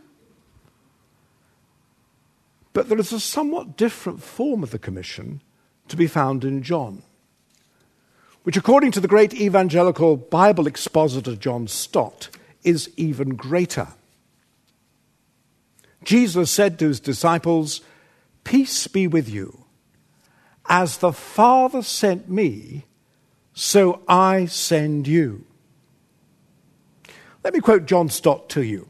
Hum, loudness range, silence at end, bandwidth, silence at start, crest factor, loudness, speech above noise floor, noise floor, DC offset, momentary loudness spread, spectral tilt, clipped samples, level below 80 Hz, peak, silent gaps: none; 8 LU; 0.05 s; 13.5 kHz; 2.75 s; 20 dB; -20 LUFS; 45 dB; -64 dBFS; under 0.1%; 16 LU; -5 dB/octave; under 0.1%; -62 dBFS; 0 dBFS; none